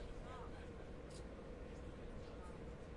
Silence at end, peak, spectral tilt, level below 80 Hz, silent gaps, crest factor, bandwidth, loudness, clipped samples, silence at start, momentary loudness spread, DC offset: 0 s; -40 dBFS; -6.5 dB/octave; -56 dBFS; none; 12 dB; 11 kHz; -54 LUFS; under 0.1%; 0 s; 1 LU; under 0.1%